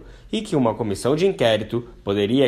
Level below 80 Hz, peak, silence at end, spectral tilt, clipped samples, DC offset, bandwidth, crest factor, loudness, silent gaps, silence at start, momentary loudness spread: -48 dBFS; -4 dBFS; 0 s; -6 dB/octave; under 0.1%; under 0.1%; 14.5 kHz; 16 dB; -22 LUFS; none; 0 s; 10 LU